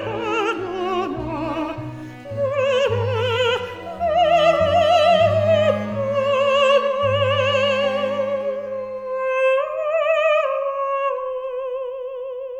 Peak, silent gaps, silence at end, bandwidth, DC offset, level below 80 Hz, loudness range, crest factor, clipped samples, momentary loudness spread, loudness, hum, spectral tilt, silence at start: -4 dBFS; none; 0 s; 9.2 kHz; under 0.1%; -52 dBFS; 6 LU; 16 dB; under 0.1%; 12 LU; -20 LUFS; none; -5.5 dB/octave; 0 s